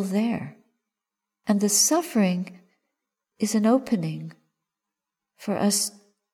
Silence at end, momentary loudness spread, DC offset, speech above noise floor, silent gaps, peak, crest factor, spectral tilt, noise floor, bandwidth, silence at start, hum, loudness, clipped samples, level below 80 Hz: 0.45 s; 18 LU; under 0.1%; 64 dB; none; -8 dBFS; 18 dB; -4 dB/octave; -87 dBFS; 18.5 kHz; 0 s; none; -23 LUFS; under 0.1%; -72 dBFS